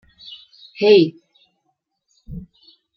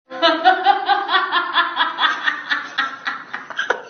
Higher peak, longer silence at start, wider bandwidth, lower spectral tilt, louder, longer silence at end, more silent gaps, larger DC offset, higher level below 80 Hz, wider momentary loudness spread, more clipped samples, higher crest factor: about the same, -2 dBFS vs 0 dBFS; first, 0.8 s vs 0.1 s; about the same, 6 kHz vs 6.6 kHz; first, -7 dB/octave vs 3 dB/octave; first, -15 LUFS vs -18 LUFS; first, 0.55 s vs 0 s; neither; neither; first, -50 dBFS vs -74 dBFS; first, 26 LU vs 11 LU; neither; about the same, 20 dB vs 18 dB